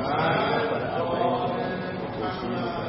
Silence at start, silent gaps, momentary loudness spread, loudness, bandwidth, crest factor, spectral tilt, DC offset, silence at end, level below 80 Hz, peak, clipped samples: 0 s; none; 7 LU; -27 LUFS; 5.8 kHz; 14 dB; -10.5 dB/octave; under 0.1%; 0 s; -52 dBFS; -12 dBFS; under 0.1%